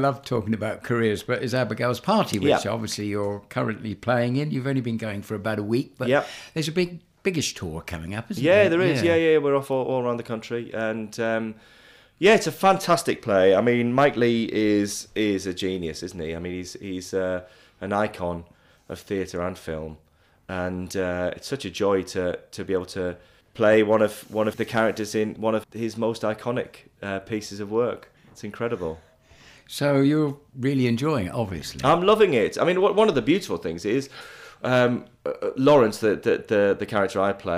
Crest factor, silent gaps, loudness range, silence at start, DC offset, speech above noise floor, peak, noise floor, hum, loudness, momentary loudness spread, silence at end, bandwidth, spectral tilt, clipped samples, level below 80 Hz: 18 dB; none; 8 LU; 0 s; under 0.1%; 29 dB; -6 dBFS; -52 dBFS; none; -24 LUFS; 14 LU; 0 s; 16 kHz; -5.5 dB/octave; under 0.1%; -56 dBFS